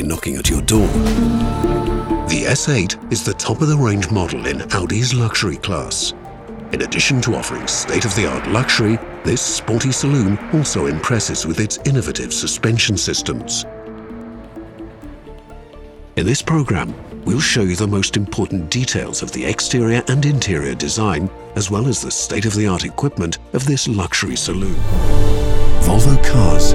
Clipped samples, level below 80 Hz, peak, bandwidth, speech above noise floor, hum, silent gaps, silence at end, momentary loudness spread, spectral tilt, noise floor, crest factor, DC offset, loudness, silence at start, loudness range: under 0.1%; -24 dBFS; 0 dBFS; 14.5 kHz; 21 dB; none; none; 0 s; 8 LU; -4.5 dB/octave; -37 dBFS; 16 dB; under 0.1%; -18 LUFS; 0 s; 3 LU